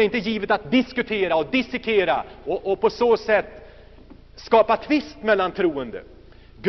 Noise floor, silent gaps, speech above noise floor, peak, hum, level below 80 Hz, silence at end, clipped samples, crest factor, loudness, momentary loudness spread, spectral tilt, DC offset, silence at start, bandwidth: -46 dBFS; none; 24 dB; -4 dBFS; none; -50 dBFS; 0 s; under 0.1%; 18 dB; -22 LUFS; 10 LU; -3 dB/octave; under 0.1%; 0 s; 6.2 kHz